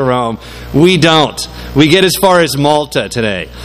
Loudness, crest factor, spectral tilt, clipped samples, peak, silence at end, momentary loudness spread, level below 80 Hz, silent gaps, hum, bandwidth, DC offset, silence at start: -10 LUFS; 12 dB; -4.5 dB/octave; 0.6%; 0 dBFS; 0 s; 9 LU; -34 dBFS; none; none; 15.5 kHz; under 0.1%; 0 s